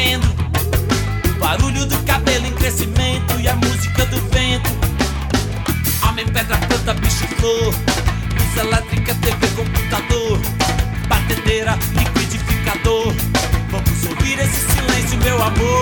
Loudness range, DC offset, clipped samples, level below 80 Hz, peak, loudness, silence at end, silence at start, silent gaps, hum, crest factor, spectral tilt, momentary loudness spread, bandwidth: 1 LU; under 0.1%; under 0.1%; -22 dBFS; -2 dBFS; -17 LUFS; 0 s; 0 s; none; none; 14 dB; -4.5 dB/octave; 3 LU; over 20 kHz